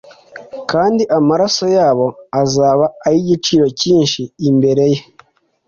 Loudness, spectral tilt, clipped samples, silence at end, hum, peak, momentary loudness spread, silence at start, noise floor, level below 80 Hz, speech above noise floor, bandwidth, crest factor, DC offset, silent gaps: -14 LUFS; -5.5 dB/octave; under 0.1%; 0.65 s; none; -2 dBFS; 6 LU; 0.35 s; -49 dBFS; -52 dBFS; 36 dB; 7.6 kHz; 12 dB; under 0.1%; none